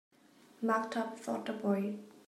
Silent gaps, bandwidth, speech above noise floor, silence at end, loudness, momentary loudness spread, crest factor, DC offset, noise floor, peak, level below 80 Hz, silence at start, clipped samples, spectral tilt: none; 14.5 kHz; 28 dB; 0.1 s; -36 LUFS; 6 LU; 20 dB; under 0.1%; -63 dBFS; -18 dBFS; -88 dBFS; 0.6 s; under 0.1%; -6 dB/octave